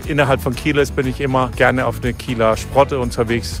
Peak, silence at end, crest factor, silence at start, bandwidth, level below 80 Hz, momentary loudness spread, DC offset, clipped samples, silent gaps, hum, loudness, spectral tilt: 0 dBFS; 0 s; 16 dB; 0 s; 16 kHz; -32 dBFS; 5 LU; under 0.1%; under 0.1%; none; none; -17 LUFS; -5.5 dB/octave